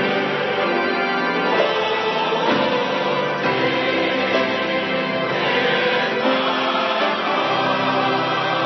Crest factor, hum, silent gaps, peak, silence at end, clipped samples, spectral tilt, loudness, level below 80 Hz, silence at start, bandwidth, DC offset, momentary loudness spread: 16 dB; none; none; -4 dBFS; 0 s; under 0.1%; -5 dB/octave; -19 LUFS; -66 dBFS; 0 s; 6.2 kHz; under 0.1%; 2 LU